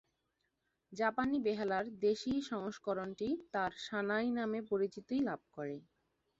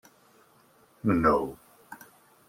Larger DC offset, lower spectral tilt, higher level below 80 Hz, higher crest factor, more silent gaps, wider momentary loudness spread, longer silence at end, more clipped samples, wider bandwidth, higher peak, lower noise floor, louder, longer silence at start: neither; second, -4 dB/octave vs -8 dB/octave; second, -72 dBFS vs -54 dBFS; about the same, 18 dB vs 20 dB; neither; second, 9 LU vs 25 LU; about the same, 0.6 s vs 0.55 s; neither; second, 7.8 kHz vs 16.5 kHz; second, -20 dBFS vs -10 dBFS; first, -83 dBFS vs -61 dBFS; second, -37 LUFS vs -26 LUFS; second, 0.9 s vs 1.05 s